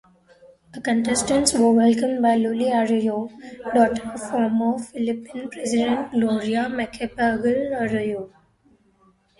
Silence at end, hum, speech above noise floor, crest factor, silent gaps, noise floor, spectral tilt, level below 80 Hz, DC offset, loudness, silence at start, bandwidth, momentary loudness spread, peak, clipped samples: 1.1 s; none; 38 dB; 22 dB; none; -60 dBFS; -4 dB/octave; -54 dBFS; under 0.1%; -22 LUFS; 0.75 s; 11.5 kHz; 12 LU; 0 dBFS; under 0.1%